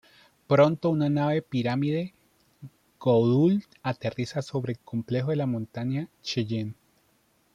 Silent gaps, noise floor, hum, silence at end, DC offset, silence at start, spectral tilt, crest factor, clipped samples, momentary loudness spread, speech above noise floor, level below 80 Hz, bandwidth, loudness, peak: none; -67 dBFS; none; 0.85 s; under 0.1%; 0.5 s; -7.5 dB/octave; 18 dB; under 0.1%; 11 LU; 41 dB; -66 dBFS; 10.5 kHz; -27 LUFS; -10 dBFS